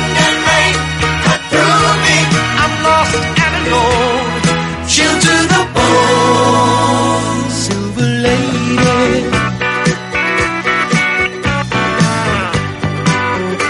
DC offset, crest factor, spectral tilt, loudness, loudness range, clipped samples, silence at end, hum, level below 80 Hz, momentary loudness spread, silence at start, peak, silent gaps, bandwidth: under 0.1%; 12 dB; -4 dB/octave; -12 LUFS; 3 LU; under 0.1%; 0 s; none; -32 dBFS; 6 LU; 0 s; 0 dBFS; none; 11.5 kHz